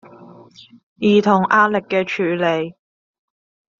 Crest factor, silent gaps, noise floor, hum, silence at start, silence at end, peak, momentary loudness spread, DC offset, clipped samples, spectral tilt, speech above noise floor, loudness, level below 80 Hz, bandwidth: 18 dB; 0.83-0.96 s; -43 dBFS; none; 0.2 s; 1.1 s; -2 dBFS; 8 LU; under 0.1%; under 0.1%; -4 dB/octave; 25 dB; -17 LUFS; -64 dBFS; 7.2 kHz